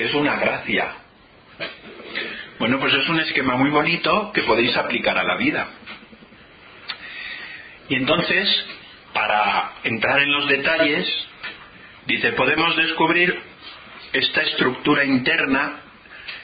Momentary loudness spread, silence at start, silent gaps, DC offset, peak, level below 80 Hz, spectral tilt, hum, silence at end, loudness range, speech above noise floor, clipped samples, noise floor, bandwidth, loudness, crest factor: 17 LU; 0 s; none; under 0.1%; -4 dBFS; -54 dBFS; -9.5 dB/octave; none; 0 s; 5 LU; 29 dB; under 0.1%; -49 dBFS; 5 kHz; -19 LUFS; 18 dB